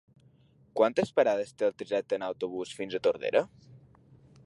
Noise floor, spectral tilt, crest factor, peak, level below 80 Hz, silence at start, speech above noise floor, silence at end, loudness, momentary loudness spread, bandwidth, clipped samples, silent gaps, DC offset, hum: -62 dBFS; -5 dB/octave; 20 dB; -10 dBFS; -70 dBFS; 0.75 s; 33 dB; 0.7 s; -30 LUFS; 9 LU; 11.5 kHz; under 0.1%; none; under 0.1%; none